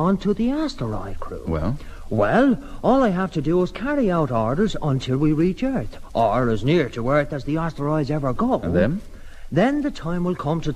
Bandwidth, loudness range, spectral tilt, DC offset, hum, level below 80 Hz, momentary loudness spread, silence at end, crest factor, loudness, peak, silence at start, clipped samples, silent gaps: 12.5 kHz; 2 LU; -8 dB/octave; under 0.1%; none; -36 dBFS; 9 LU; 0 s; 16 dB; -22 LUFS; -6 dBFS; 0 s; under 0.1%; none